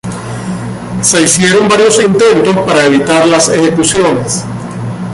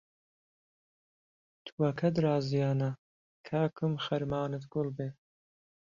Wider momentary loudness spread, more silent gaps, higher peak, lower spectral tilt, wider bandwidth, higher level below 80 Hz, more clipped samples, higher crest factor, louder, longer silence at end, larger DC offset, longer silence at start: about the same, 13 LU vs 12 LU; second, none vs 1.72-1.78 s, 2.98-3.44 s; first, 0 dBFS vs -16 dBFS; second, -4 dB/octave vs -8 dB/octave; first, 12.5 kHz vs 7.2 kHz; first, -40 dBFS vs -68 dBFS; neither; second, 10 dB vs 18 dB; first, -8 LUFS vs -32 LUFS; second, 0 s vs 0.85 s; neither; second, 0.05 s vs 1.65 s